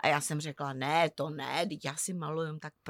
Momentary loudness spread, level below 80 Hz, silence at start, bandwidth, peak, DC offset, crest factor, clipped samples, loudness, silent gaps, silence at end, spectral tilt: 8 LU; -78 dBFS; 0 s; 18 kHz; -14 dBFS; under 0.1%; 18 dB; under 0.1%; -33 LUFS; none; 0 s; -4 dB/octave